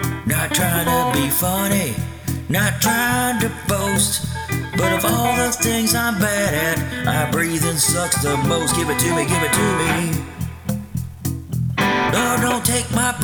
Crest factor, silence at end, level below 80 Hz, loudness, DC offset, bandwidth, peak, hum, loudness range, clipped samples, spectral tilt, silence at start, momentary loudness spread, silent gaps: 18 dB; 0 s; -38 dBFS; -18 LUFS; under 0.1%; over 20 kHz; -2 dBFS; none; 2 LU; under 0.1%; -4 dB/octave; 0 s; 8 LU; none